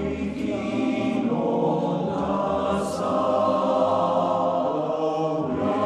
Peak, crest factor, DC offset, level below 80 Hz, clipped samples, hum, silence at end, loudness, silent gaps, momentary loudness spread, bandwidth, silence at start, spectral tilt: -10 dBFS; 14 dB; under 0.1%; -50 dBFS; under 0.1%; none; 0 s; -24 LUFS; none; 4 LU; 12.5 kHz; 0 s; -7 dB/octave